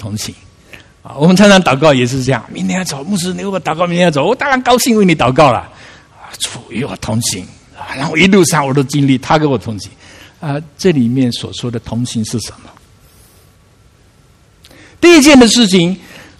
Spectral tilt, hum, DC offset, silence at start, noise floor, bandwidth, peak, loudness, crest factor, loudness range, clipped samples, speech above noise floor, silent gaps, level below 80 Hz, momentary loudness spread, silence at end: -4.5 dB/octave; none; under 0.1%; 0 s; -47 dBFS; 15 kHz; 0 dBFS; -11 LUFS; 12 dB; 7 LU; 0.3%; 36 dB; none; -42 dBFS; 16 LU; 0.15 s